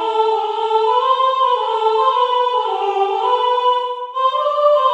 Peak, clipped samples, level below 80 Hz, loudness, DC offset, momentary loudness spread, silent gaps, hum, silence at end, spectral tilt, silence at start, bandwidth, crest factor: -2 dBFS; under 0.1%; -88 dBFS; -16 LUFS; under 0.1%; 4 LU; none; none; 0 s; -0.5 dB/octave; 0 s; 8.8 kHz; 14 dB